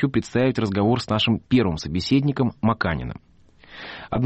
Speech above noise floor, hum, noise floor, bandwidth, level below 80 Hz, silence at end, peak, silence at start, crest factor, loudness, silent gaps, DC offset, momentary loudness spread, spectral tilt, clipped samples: 27 dB; none; -48 dBFS; 8.4 kHz; -44 dBFS; 0 s; -8 dBFS; 0 s; 14 dB; -22 LUFS; none; under 0.1%; 16 LU; -6.5 dB/octave; under 0.1%